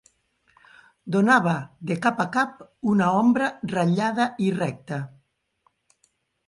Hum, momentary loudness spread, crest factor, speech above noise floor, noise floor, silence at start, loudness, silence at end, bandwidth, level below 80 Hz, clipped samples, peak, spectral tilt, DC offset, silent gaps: none; 13 LU; 18 dB; 46 dB; -69 dBFS; 1.05 s; -23 LUFS; 1.4 s; 11.5 kHz; -66 dBFS; under 0.1%; -6 dBFS; -6.5 dB/octave; under 0.1%; none